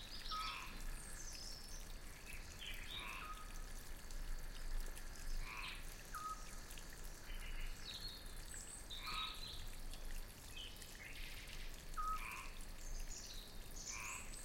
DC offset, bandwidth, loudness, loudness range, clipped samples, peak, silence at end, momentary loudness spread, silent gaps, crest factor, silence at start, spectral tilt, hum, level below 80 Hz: under 0.1%; 16.5 kHz; -50 LUFS; 2 LU; under 0.1%; -32 dBFS; 0 s; 9 LU; none; 14 dB; 0 s; -2 dB/octave; none; -50 dBFS